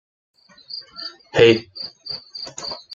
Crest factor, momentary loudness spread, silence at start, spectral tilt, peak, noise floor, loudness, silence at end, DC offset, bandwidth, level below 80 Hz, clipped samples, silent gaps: 22 dB; 19 LU; 0.7 s; -4.5 dB/octave; -2 dBFS; -38 dBFS; -20 LUFS; 0 s; under 0.1%; 7.6 kHz; -56 dBFS; under 0.1%; none